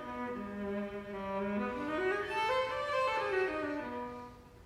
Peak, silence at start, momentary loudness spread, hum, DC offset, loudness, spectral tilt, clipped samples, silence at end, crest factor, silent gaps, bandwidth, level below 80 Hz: -20 dBFS; 0 s; 9 LU; none; under 0.1%; -36 LUFS; -5.5 dB/octave; under 0.1%; 0 s; 16 dB; none; 15 kHz; -62 dBFS